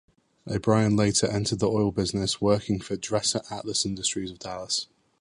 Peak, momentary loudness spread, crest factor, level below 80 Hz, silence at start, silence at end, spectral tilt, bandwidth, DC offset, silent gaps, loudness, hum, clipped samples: -8 dBFS; 10 LU; 18 dB; -50 dBFS; 0.45 s; 0.35 s; -4.5 dB/octave; 11.5 kHz; under 0.1%; none; -26 LUFS; none; under 0.1%